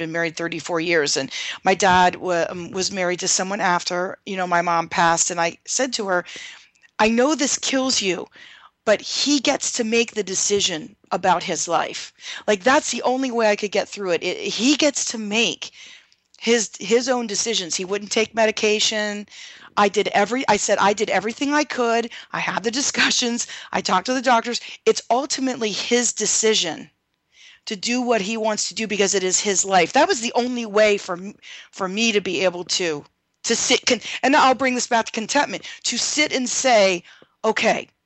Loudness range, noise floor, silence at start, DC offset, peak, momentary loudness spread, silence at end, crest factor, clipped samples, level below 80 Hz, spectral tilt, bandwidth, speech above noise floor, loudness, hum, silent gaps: 2 LU; -55 dBFS; 0 s; under 0.1%; -4 dBFS; 10 LU; 0.2 s; 16 dB; under 0.1%; -60 dBFS; -2 dB/octave; 9.4 kHz; 34 dB; -20 LUFS; none; none